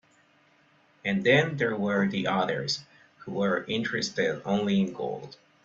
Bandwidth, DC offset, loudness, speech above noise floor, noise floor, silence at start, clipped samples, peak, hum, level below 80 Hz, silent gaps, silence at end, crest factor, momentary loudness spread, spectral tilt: 8 kHz; under 0.1%; -27 LUFS; 36 dB; -63 dBFS; 1.05 s; under 0.1%; -8 dBFS; none; -66 dBFS; none; 0.3 s; 20 dB; 12 LU; -5.5 dB/octave